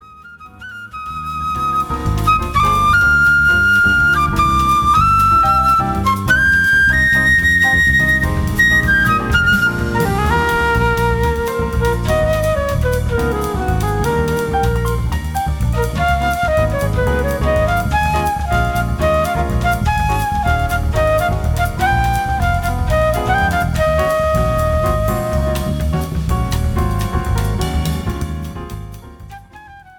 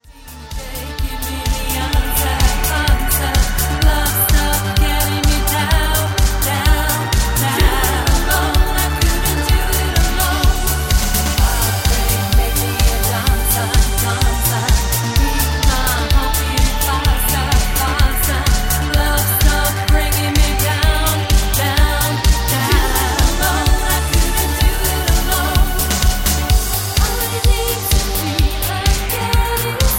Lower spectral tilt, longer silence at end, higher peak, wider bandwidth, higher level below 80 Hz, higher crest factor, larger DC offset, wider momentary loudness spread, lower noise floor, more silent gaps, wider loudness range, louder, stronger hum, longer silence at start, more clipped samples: first, -5.5 dB/octave vs -3.5 dB/octave; first, 0.2 s vs 0 s; about the same, -2 dBFS vs 0 dBFS; about the same, 18.5 kHz vs 17 kHz; about the same, -22 dBFS vs -18 dBFS; about the same, 12 dB vs 14 dB; neither; first, 9 LU vs 2 LU; first, -39 dBFS vs -35 dBFS; neither; first, 6 LU vs 1 LU; about the same, -15 LUFS vs -16 LUFS; neither; about the same, 0.1 s vs 0.1 s; neither